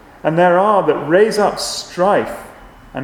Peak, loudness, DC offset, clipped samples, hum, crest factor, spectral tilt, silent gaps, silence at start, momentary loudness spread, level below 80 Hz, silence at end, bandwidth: 0 dBFS; -15 LUFS; under 0.1%; under 0.1%; none; 16 dB; -4.5 dB/octave; none; 0.25 s; 12 LU; -48 dBFS; 0 s; 17 kHz